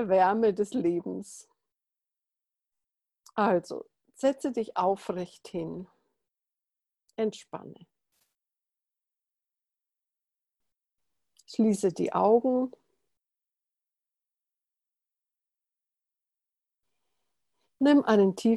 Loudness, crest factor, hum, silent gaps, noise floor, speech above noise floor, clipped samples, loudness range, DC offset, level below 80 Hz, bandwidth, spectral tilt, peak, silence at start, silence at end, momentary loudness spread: -27 LUFS; 20 dB; none; none; -89 dBFS; 63 dB; under 0.1%; 12 LU; under 0.1%; -74 dBFS; 12.5 kHz; -6.5 dB/octave; -10 dBFS; 0 s; 0 s; 18 LU